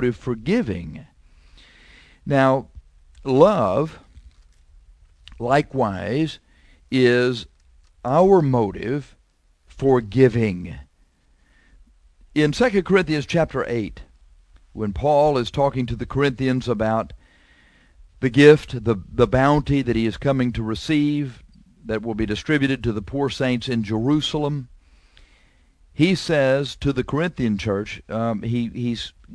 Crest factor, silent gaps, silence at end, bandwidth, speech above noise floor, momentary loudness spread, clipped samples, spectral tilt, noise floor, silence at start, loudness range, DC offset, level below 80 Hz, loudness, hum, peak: 22 dB; none; 0 s; 11 kHz; 40 dB; 13 LU; under 0.1%; -7 dB/octave; -60 dBFS; 0 s; 4 LU; under 0.1%; -42 dBFS; -21 LUFS; none; 0 dBFS